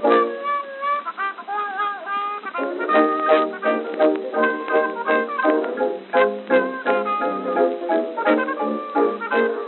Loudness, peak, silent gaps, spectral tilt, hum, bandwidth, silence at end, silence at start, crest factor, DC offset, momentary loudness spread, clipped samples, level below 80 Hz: -21 LUFS; -2 dBFS; none; -2 dB/octave; none; 4.3 kHz; 0 s; 0 s; 18 dB; under 0.1%; 7 LU; under 0.1%; under -90 dBFS